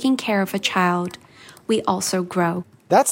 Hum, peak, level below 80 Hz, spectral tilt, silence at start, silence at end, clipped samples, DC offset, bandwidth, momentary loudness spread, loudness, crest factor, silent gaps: none; -2 dBFS; -64 dBFS; -4 dB/octave; 0 s; 0 s; under 0.1%; under 0.1%; 16.5 kHz; 12 LU; -21 LUFS; 18 dB; none